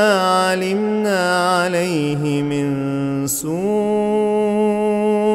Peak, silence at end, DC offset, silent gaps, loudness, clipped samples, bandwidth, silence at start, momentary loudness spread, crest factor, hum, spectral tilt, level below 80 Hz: -2 dBFS; 0 s; under 0.1%; none; -18 LUFS; under 0.1%; 16 kHz; 0 s; 4 LU; 16 dB; none; -5 dB/octave; -54 dBFS